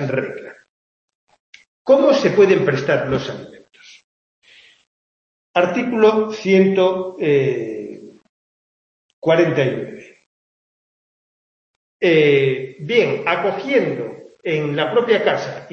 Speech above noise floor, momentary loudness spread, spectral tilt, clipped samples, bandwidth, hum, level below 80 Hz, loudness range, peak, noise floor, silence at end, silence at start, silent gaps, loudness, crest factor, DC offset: over 73 dB; 15 LU; -6.5 dB/octave; under 0.1%; 7 kHz; none; -60 dBFS; 5 LU; -2 dBFS; under -90 dBFS; 0.05 s; 0 s; 0.69-1.08 s, 1.15-1.27 s, 1.40-1.53 s, 1.67-1.85 s, 4.04-4.42 s, 4.87-5.54 s, 8.29-9.22 s, 10.26-12.00 s; -17 LUFS; 18 dB; under 0.1%